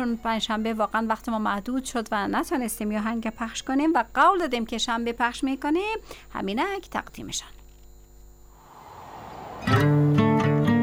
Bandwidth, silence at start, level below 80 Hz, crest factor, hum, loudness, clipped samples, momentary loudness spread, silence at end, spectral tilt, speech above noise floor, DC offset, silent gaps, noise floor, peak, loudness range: 17 kHz; 0 s; -48 dBFS; 16 dB; 50 Hz at -50 dBFS; -25 LUFS; under 0.1%; 13 LU; 0 s; -5.5 dB/octave; 24 dB; under 0.1%; none; -49 dBFS; -8 dBFS; 9 LU